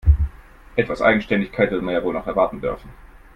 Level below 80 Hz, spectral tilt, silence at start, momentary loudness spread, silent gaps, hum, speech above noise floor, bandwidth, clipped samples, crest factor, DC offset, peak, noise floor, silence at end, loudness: -28 dBFS; -8.5 dB/octave; 0.05 s; 10 LU; none; none; 20 dB; 6.2 kHz; under 0.1%; 18 dB; under 0.1%; -2 dBFS; -40 dBFS; 0.3 s; -21 LUFS